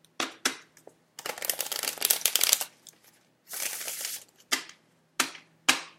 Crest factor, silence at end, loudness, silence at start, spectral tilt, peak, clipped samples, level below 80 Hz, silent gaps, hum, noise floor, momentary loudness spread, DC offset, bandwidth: 32 dB; 0.1 s; -28 LUFS; 0.2 s; 1.5 dB/octave; 0 dBFS; under 0.1%; -78 dBFS; none; none; -62 dBFS; 17 LU; under 0.1%; 16.5 kHz